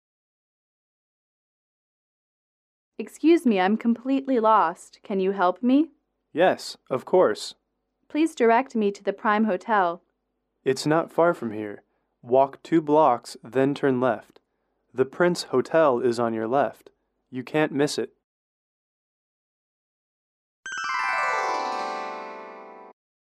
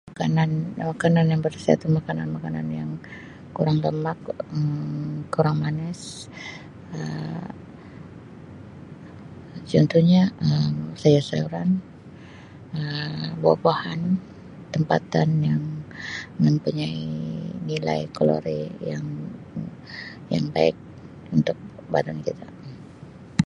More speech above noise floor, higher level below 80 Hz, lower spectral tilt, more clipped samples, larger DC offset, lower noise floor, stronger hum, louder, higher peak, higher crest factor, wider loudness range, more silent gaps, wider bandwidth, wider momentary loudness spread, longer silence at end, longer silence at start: first, 54 dB vs 20 dB; second, -76 dBFS vs -54 dBFS; second, -5.5 dB/octave vs -7.5 dB/octave; neither; neither; first, -77 dBFS vs -43 dBFS; neither; about the same, -23 LUFS vs -24 LUFS; second, -8 dBFS vs -2 dBFS; about the same, 18 dB vs 22 dB; about the same, 7 LU vs 7 LU; first, 18.24-20.63 s vs none; first, 13.5 kHz vs 10.5 kHz; second, 15 LU vs 22 LU; first, 0.55 s vs 0 s; first, 3 s vs 0.05 s